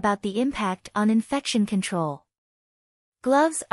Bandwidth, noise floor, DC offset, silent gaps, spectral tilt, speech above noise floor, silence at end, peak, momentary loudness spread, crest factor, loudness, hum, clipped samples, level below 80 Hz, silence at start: 12 kHz; under -90 dBFS; under 0.1%; 2.38-3.12 s; -5 dB/octave; over 66 dB; 0.1 s; -10 dBFS; 8 LU; 16 dB; -24 LUFS; none; under 0.1%; -58 dBFS; 0 s